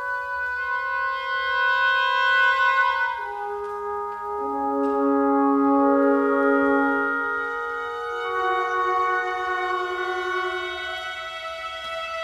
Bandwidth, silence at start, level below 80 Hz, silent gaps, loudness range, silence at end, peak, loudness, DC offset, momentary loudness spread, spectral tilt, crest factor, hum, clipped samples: 12.5 kHz; 0 s; -58 dBFS; none; 4 LU; 0 s; -8 dBFS; -23 LUFS; under 0.1%; 11 LU; -3.5 dB/octave; 14 dB; none; under 0.1%